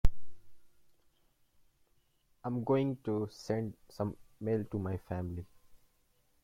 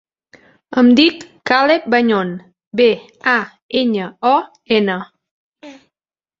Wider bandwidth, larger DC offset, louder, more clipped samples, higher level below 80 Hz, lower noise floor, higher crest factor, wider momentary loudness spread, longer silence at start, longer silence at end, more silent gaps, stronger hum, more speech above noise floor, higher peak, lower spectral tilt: first, 10.5 kHz vs 7.6 kHz; neither; second, -37 LUFS vs -15 LUFS; neither; first, -44 dBFS vs -60 dBFS; second, -72 dBFS vs under -90 dBFS; first, 24 dB vs 16 dB; about the same, 11 LU vs 13 LU; second, 0.05 s vs 0.7 s; about the same, 0.65 s vs 0.7 s; second, none vs 2.67-2.71 s, 3.62-3.69 s, 5.31-5.52 s; neither; second, 37 dB vs over 75 dB; second, -12 dBFS vs 0 dBFS; first, -8 dB/octave vs -5.5 dB/octave